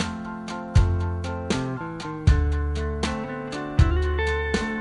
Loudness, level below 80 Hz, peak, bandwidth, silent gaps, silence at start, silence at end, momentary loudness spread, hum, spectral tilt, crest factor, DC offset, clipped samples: -25 LUFS; -28 dBFS; -4 dBFS; 11 kHz; none; 0 s; 0 s; 10 LU; none; -6.5 dB/octave; 20 dB; under 0.1%; under 0.1%